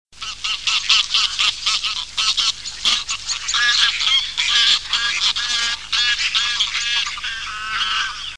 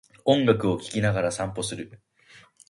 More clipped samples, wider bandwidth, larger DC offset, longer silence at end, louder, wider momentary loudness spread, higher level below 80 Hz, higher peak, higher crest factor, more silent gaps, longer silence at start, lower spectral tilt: neither; about the same, 10.5 kHz vs 11.5 kHz; first, 0.7% vs under 0.1%; second, 0 s vs 0.75 s; first, -17 LUFS vs -25 LUFS; second, 8 LU vs 13 LU; first, -48 dBFS vs -54 dBFS; first, 0 dBFS vs -4 dBFS; about the same, 20 dB vs 22 dB; neither; second, 0.05 s vs 0.25 s; second, 3 dB/octave vs -5.5 dB/octave